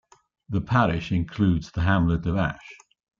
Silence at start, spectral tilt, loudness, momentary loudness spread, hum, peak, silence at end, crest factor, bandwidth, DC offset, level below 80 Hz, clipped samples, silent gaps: 0.5 s; -8 dB/octave; -24 LUFS; 8 LU; none; -8 dBFS; 0.45 s; 16 dB; 7.4 kHz; under 0.1%; -42 dBFS; under 0.1%; none